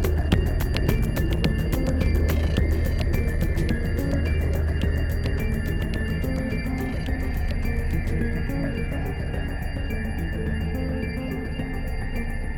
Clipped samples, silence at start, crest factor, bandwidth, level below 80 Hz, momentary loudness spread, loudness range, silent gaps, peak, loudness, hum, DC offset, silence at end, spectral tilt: under 0.1%; 0 s; 18 dB; 18.5 kHz; -26 dBFS; 6 LU; 5 LU; none; -6 dBFS; -26 LUFS; none; under 0.1%; 0 s; -7 dB/octave